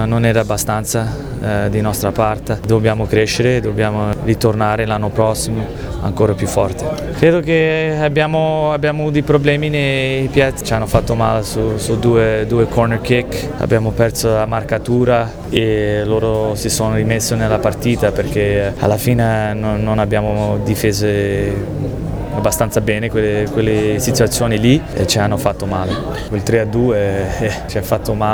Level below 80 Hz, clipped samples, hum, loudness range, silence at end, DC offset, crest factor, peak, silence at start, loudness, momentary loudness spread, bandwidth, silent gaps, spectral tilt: -30 dBFS; under 0.1%; none; 2 LU; 0 s; under 0.1%; 16 dB; 0 dBFS; 0 s; -16 LUFS; 6 LU; over 20 kHz; none; -5.5 dB/octave